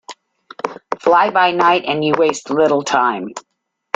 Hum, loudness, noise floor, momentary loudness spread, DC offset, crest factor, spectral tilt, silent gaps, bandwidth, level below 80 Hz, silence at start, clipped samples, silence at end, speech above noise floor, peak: none; -15 LUFS; -41 dBFS; 14 LU; under 0.1%; 16 dB; -4 dB/octave; none; 9.4 kHz; -60 dBFS; 0.1 s; under 0.1%; 0.55 s; 26 dB; -2 dBFS